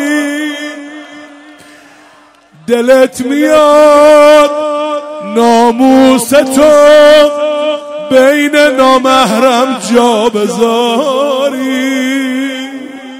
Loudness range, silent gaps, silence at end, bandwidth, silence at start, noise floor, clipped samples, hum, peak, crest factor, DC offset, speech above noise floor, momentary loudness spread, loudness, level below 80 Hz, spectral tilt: 5 LU; none; 0 s; 16 kHz; 0 s; -41 dBFS; 2%; none; 0 dBFS; 8 dB; under 0.1%; 35 dB; 14 LU; -8 LUFS; -46 dBFS; -3.5 dB/octave